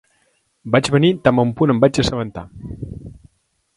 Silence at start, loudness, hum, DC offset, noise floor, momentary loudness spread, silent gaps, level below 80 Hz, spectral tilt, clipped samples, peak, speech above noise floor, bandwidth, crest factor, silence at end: 0.65 s; -16 LUFS; none; under 0.1%; -65 dBFS; 19 LU; none; -42 dBFS; -6 dB/octave; under 0.1%; 0 dBFS; 49 dB; 11.5 kHz; 18 dB; 0.65 s